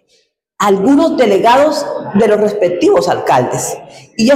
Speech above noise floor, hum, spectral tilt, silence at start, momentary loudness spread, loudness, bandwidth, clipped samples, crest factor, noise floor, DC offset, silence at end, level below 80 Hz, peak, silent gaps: 46 dB; none; -5 dB/octave; 0.6 s; 9 LU; -12 LUFS; 16 kHz; under 0.1%; 10 dB; -57 dBFS; under 0.1%; 0 s; -50 dBFS; -2 dBFS; none